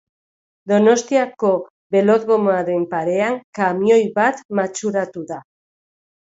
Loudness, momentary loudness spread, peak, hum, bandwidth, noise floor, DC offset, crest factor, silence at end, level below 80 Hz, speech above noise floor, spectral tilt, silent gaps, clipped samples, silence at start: -18 LUFS; 9 LU; -2 dBFS; none; 8 kHz; under -90 dBFS; under 0.1%; 18 dB; 0.9 s; -66 dBFS; over 73 dB; -5.5 dB/octave; 1.70-1.90 s, 3.44-3.53 s, 4.45-4.49 s; under 0.1%; 0.65 s